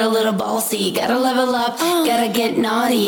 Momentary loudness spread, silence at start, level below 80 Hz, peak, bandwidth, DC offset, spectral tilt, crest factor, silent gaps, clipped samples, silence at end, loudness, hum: 2 LU; 0 s; -60 dBFS; -6 dBFS; 19 kHz; under 0.1%; -3.5 dB/octave; 12 dB; none; under 0.1%; 0 s; -18 LUFS; none